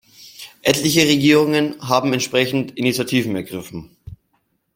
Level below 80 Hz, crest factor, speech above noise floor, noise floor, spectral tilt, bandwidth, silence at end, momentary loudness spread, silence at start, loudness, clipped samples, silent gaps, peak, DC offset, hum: -54 dBFS; 18 dB; 50 dB; -67 dBFS; -4 dB/octave; 16.5 kHz; 0.6 s; 19 LU; 0.2 s; -17 LUFS; under 0.1%; none; -2 dBFS; under 0.1%; none